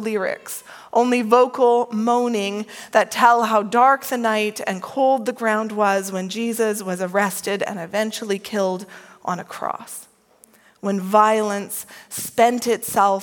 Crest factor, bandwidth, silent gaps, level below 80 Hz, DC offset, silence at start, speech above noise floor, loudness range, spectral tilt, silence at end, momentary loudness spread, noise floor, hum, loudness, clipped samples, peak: 20 dB; 17.5 kHz; none; -70 dBFS; under 0.1%; 0 s; 34 dB; 7 LU; -4 dB/octave; 0 s; 14 LU; -54 dBFS; none; -20 LUFS; under 0.1%; 0 dBFS